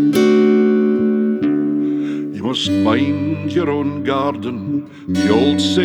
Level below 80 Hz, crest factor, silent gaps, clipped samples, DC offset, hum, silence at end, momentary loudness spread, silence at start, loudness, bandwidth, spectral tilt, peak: -56 dBFS; 14 dB; none; under 0.1%; under 0.1%; none; 0 s; 10 LU; 0 s; -17 LUFS; 13.5 kHz; -6 dB/octave; 0 dBFS